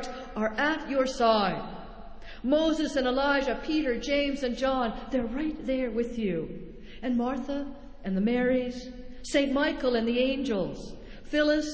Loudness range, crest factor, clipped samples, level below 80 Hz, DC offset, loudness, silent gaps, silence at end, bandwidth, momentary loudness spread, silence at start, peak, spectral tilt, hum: 4 LU; 18 dB; under 0.1%; -48 dBFS; under 0.1%; -28 LUFS; none; 0 s; 8 kHz; 16 LU; 0 s; -10 dBFS; -5 dB/octave; none